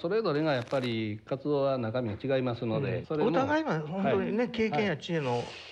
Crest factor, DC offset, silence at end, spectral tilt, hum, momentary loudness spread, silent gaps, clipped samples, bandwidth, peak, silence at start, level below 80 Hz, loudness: 14 dB; under 0.1%; 0 s; -7 dB/octave; none; 5 LU; none; under 0.1%; 9.6 kHz; -14 dBFS; 0 s; -66 dBFS; -30 LUFS